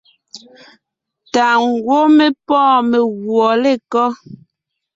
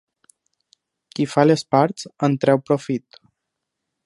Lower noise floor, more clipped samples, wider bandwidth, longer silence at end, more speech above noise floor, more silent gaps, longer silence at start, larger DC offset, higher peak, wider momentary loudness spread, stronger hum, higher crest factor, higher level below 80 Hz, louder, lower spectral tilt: second, -76 dBFS vs -80 dBFS; neither; second, 7.8 kHz vs 11.5 kHz; second, 0.6 s vs 1.05 s; about the same, 62 dB vs 61 dB; neither; second, 0.35 s vs 1.2 s; neither; about the same, -2 dBFS vs -2 dBFS; second, 6 LU vs 11 LU; neither; second, 14 dB vs 20 dB; first, -62 dBFS vs -68 dBFS; first, -14 LUFS vs -20 LUFS; second, -4.5 dB/octave vs -6.5 dB/octave